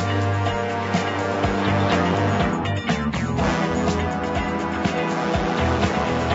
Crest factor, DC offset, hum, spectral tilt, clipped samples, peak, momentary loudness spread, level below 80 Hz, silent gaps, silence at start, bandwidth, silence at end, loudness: 14 dB; under 0.1%; none; -6 dB/octave; under 0.1%; -6 dBFS; 4 LU; -36 dBFS; none; 0 s; 8 kHz; 0 s; -22 LUFS